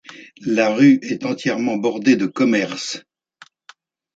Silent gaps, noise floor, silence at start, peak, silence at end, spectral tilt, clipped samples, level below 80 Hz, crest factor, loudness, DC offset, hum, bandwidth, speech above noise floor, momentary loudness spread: none; -50 dBFS; 0.1 s; -2 dBFS; 1.15 s; -5 dB/octave; under 0.1%; -66 dBFS; 16 dB; -18 LUFS; under 0.1%; none; 8 kHz; 33 dB; 13 LU